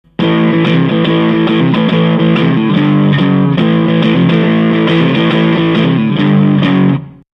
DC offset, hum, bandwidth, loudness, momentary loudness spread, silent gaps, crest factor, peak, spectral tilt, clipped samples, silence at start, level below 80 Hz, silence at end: under 0.1%; none; 5.8 kHz; -10 LUFS; 1 LU; none; 10 dB; 0 dBFS; -9 dB/octave; under 0.1%; 0.2 s; -46 dBFS; 0.3 s